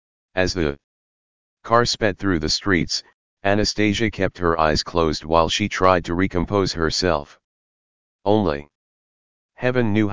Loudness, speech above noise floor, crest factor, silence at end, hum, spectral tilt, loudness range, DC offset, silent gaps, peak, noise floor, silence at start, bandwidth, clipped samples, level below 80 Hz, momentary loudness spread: -21 LUFS; over 70 dB; 20 dB; 0 s; none; -4.5 dB/octave; 4 LU; 1%; 0.84-1.57 s, 3.14-3.37 s, 7.44-8.19 s, 8.75-9.49 s; 0 dBFS; under -90 dBFS; 0.3 s; 7.6 kHz; under 0.1%; -38 dBFS; 8 LU